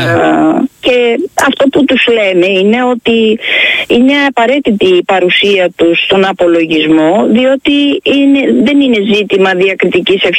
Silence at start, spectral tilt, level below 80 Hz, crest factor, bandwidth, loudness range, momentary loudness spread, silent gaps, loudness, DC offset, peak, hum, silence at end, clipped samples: 0 s; -5 dB/octave; -48 dBFS; 8 dB; 13 kHz; 1 LU; 2 LU; none; -8 LUFS; under 0.1%; 0 dBFS; none; 0 s; under 0.1%